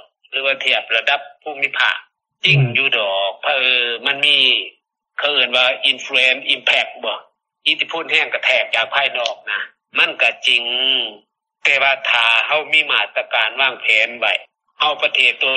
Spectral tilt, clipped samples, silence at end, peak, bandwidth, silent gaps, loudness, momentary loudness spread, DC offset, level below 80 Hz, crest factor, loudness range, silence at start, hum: -3 dB/octave; under 0.1%; 0 s; 0 dBFS; 10 kHz; none; -15 LUFS; 9 LU; under 0.1%; -70 dBFS; 18 dB; 2 LU; 0.3 s; none